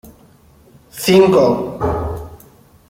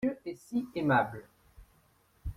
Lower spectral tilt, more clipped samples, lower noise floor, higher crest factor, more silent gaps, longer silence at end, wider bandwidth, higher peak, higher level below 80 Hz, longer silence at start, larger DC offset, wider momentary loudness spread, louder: second, -6 dB/octave vs -7.5 dB/octave; neither; second, -48 dBFS vs -67 dBFS; about the same, 16 dB vs 20 dB; neither; first, 0.55 s vs 0.05 s; about the same, 16.5 kHz vs 15.5 kHz; first, -2 dBFS vs -14 dBFS; first, -38 dBFS vs -52 dBFS; about the same, 0.05 s vs 0 s; neither; first, 22 LU vs 17 LU; first, -15 LUFS vs -32 LUFS